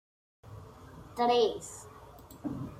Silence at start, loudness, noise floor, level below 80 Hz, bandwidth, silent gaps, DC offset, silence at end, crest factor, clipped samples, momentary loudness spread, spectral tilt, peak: 0.45 s; -31 LUFS; -51 dBFS; -60 dBFS; 16 kHz; none; under 0.1%; 0 s; 18 dB; under 0.1%; 25 LU; -4.5 dB/octave; -16 dBFS